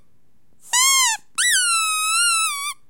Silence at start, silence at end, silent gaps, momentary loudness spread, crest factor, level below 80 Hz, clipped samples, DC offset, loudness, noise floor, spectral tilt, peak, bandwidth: 0.65 s; 0.15 s; none; 5 LU; 18 dB; -72 dBFS; under 0.1%; 0.5%; -17 LUFS; -64 dBFS; 6 dB/octave; -4 dBFS; 16.5 kHz